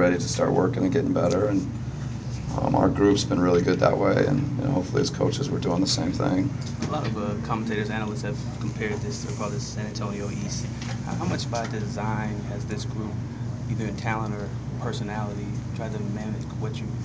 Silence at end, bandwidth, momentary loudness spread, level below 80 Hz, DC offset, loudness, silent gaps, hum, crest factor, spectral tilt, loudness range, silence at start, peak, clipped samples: 0 s; 8 kHz; 10 LU; -42 dBFS; under 0.1%; -26 LUFS; none; none; 20 dB; -6 dB/octave; 7 LU; 0 s; -6 dBFS; under 0.1%